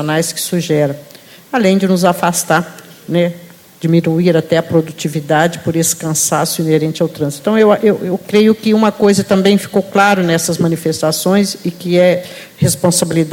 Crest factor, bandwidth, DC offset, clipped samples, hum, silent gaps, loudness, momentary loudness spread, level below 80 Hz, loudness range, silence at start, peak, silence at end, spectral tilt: 14 dB; 17.5 kHz; under 0.1%; under 0.1%; none; none; -13 LUFS; 8 LU; -52 dBFS; 3 LU; 0 s; 0 dBFS; 0 s; -5 dB/octave